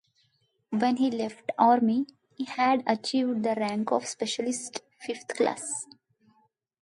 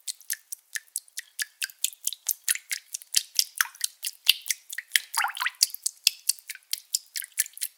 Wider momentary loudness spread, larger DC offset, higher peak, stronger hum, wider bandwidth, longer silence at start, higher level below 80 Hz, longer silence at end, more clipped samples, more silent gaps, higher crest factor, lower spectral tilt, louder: first, 14 LU vs 10 LU; neither; second, -8 dBFS vs 0 dBFS; neither; second, 11.5 kHz vs 19 kHz; first, 0.7 s vs 0.05 s; about the same, -78 dBFS vs -82 dBFS; first, 1 s vs 0.1 s; neither; neither; second, 20 dB vs 30 dB; first, -4 dB/octave vs 6 dB/octave; about the same, -28 LUFS vs -27 LUFS